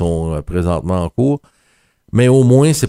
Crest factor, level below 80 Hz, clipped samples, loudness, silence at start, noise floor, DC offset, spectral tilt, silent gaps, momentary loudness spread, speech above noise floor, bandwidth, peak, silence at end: 14 dB; -36 dBFS; under 0.1%; -15 LUFS; 0 s; -58 dBFS; under 0.1%; -7 dB/octave; none; 10 LU; 45 dB; 15.5 kHz; 0 dBFS; 0 s